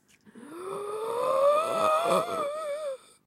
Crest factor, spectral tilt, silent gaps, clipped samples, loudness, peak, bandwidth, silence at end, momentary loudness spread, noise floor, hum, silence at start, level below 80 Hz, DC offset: 18 dB; -4 dB/octave; none; under 0.1%; -27 LUFS; -12 dBFS; 16 kHz; 0.3 s; 14 LU; -51 dBFS; none; 0.25 s; -80 dBFS; under 0.1%